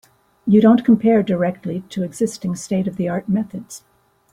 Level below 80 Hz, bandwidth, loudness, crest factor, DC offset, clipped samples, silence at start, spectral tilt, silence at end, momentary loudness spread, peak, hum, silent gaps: -56 dBFS; 12.5 kHz; -18 LUFS; 16 dB; under 0.1%; under 0.1%; 0.45 s; -7 dB/octave; 0.55 s; 16 LU; -2 dBFS; none; none